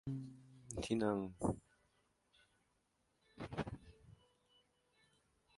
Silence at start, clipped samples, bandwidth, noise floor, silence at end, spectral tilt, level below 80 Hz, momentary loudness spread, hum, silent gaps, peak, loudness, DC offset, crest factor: 0.05 s; under 0.1%; 11.5 kHz; -81 dBFS; 1.45 s; -6 dB/octave; -64 dBFS; 18 LU; none; none; -22 dBFS; -43 LUFS; under 0.1%; 24 dB